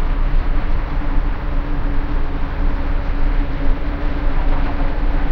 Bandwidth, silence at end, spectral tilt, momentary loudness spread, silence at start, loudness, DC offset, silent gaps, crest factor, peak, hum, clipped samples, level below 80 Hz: 4.8 kHz; 0 s; -8.5 dB/octave; 2 LU; 0 s; -24 LUFS; under 0.1%; none; 12 dB; -4 dBFS; none; under 0.1%; -16 dBFS